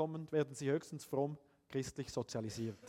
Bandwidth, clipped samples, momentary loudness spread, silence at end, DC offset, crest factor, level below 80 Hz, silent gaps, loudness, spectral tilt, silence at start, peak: 16 kHz; under 0.1%; 6 LU; 0 s; under 0.1%; 18 dB; -70 dBFS; none; -41 LUFS; -6 dB/octave; 0 s; -22 dBFS